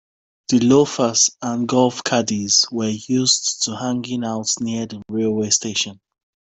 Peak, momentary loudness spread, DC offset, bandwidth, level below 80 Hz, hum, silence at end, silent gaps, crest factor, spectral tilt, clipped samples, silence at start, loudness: -2 dBFS; 9 LU; under 0.1%; 8.4 kHz; -60 dBFS; none; 0.65 s; none; 18 dB; -3 dB/octave; under 0.1%; 0.5 s; -18 LUFS